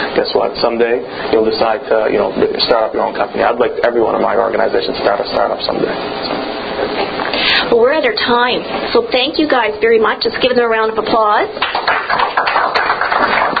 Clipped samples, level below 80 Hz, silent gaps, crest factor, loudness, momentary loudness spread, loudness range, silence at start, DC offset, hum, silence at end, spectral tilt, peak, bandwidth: under 0.1%; -44 dBFS; none; 14 dB; -14 LUFS; 6 LU; 3 LU; 0 s; under 0.1%; none; 0 s; -6.5 dB/octave; 0 dBFS; 5 kHz